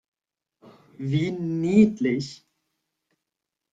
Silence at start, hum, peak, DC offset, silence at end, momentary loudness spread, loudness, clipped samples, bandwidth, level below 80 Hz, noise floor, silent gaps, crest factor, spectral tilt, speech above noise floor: 1 s; none; -6 dBFS; under 0.1%; 1.4 s; 14 LU; -23 LUFS; under 0.1%; 7.8 kHz; -62 dBFS; -85 dBFS; none; 20 dB; -7.5 dB/octave; 63 dB